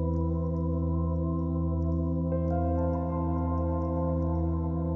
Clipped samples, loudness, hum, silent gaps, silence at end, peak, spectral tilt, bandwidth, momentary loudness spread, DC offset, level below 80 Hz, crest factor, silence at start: under 0.1%; -29 LUFS; none; none; 0 s; -18 dBFS; -13 dB/octave; 2.2 kHz; 2 LU; under 0.1%; -34 dBFS; 10 dB; 0 s